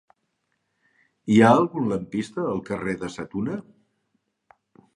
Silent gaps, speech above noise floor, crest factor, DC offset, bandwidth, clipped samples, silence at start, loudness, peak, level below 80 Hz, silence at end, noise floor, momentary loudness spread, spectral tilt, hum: none; 53 dB; 22 dB; under 0.1%; 11 kHz; under 0.1%; 1.25 s; -23 LUFS; -2 dBFS; -58 dBFS; 1.35 s; -75 dBFS; 15 LU; -7 dB/octave; none